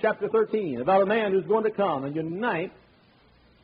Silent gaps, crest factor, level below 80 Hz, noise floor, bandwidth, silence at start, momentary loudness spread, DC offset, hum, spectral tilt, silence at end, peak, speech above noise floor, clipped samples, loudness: none; 18 dB; -66 dBFS; -59 dBFS; 5 kHz; 0 s; 8 LU; under 0.1%; none; -4.5 dB/octave; 0.95 s; -8 dBFS; 34 dB; under 0.1%; -25 LUFS